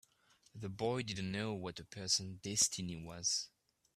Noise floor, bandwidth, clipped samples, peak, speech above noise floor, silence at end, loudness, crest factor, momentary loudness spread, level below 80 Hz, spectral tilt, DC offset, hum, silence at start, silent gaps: -71 dBFS; 15 kHz; under 0.1%; -18 dBFS; 32 dB; 0.5 s; -37 LUFS; 22 dB; 14 LU; -70 dBFS; -2.5 dB/octave; under 0.1%; none; 0.55 s; none